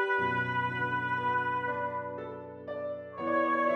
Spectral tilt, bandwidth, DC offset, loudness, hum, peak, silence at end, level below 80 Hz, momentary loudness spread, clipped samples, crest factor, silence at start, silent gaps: -7 dB/octave; 8.2 kHz; under 0.1%; -32 LUFS; none; -18 dBFS; 0 s; -72 dBFS; 12 LU; under 0.1%; 14 dB; 0 s; none